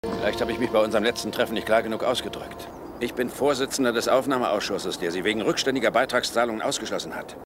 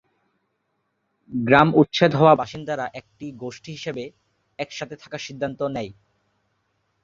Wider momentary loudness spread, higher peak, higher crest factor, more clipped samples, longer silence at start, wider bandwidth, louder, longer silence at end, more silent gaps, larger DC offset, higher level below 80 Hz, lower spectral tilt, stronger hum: second, 9 LU vs 19 LU; second, -8 dBFS vs -2 dBFS; second, 16 dB vs 22 dB; neither; second, 0.05 s vs 1.3 s; first, 16 kHz vs 7.6 kHz; second, -25 LUFS vs -21 LUFS; second, 0 s vs 1.1 s; neither; neither; about the same, -54 dBFS vs -58 dBFS; second, -3.5 dB/octave vs -6.5 dB/octave; neither